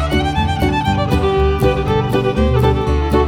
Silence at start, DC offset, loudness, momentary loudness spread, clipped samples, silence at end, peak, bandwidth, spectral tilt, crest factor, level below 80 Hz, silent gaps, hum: 0 s; under 0.1%; -16 LUFS; 2 LU; under 0.1%; 0 s; -2 dBFS; 16 kHz; -7 dB/octave; 14 dB; -22 dBFS; none; none